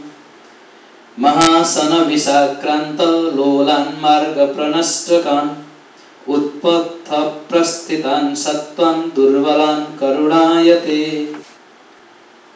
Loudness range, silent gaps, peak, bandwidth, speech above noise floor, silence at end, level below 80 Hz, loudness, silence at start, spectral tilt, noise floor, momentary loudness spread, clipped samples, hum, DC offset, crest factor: 4 LU; none; 0 dBFS; 8 kHz; 30 dB; 1.15 s; -60 dBFS; -15 LUFS; 0 s; -3.5 dB/octave; -44 dBFS; 8 LU; under 0.1%; none; under 0.1%; 16 dB